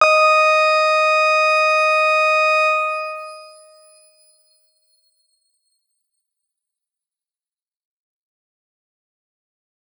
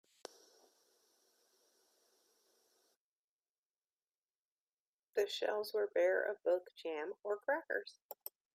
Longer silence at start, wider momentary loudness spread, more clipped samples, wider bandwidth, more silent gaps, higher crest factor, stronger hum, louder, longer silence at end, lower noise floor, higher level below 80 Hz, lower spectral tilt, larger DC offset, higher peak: second, 0 s vs 5.15 s; second, 12 LU vs 17 LU; neither; first, over 20 kHz vs 15.5 kHz; second, none vs 8.02-8.09 s; about the same, 20 dB vs 20 dB; neither; first, -14 LUFS vs -38 LUFS; first, 6.5 s vs 0.4 s; about the same, under -90 dBFS vs under -90 dBFS; about the same, under -90 dBFS vs under -90 dBFS; second, 3 dB/octave vs -2 dB/octave; neither; first, 0 dBFS vs -22 dBFS